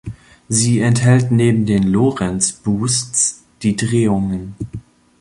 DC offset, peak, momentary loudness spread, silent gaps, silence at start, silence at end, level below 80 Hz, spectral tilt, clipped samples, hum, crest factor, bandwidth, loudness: under 0.1%; -2 dBFS; 14 LU; none; 0.05 s; 0.4 s; -44 dBFS; -5 dB/octave; under 0.1%; none; 14 dB; 11.5 kHz; -16 LUFS